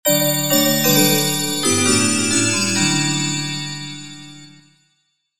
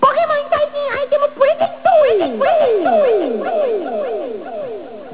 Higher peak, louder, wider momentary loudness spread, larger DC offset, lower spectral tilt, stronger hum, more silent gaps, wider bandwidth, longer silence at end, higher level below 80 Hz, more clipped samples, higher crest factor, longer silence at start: about the same, -2 dBFS vs 0 dBFS; about the same, -16 LUFS vs -16 LUFS; about the same, 15 LU vs 13 LU; about the same, 1% vs 0.7%; second, -2.5 dB/octave vs -8 dB/octave; neither; neither; first, 18 kHz vs 4 kHz; about the same, 0 s vs 0 s; about the same, -58 dBFS vs -58 dBFS; neither; about the same, 18 dB vs 16 dB; about the same, 0.05 s vs 0 s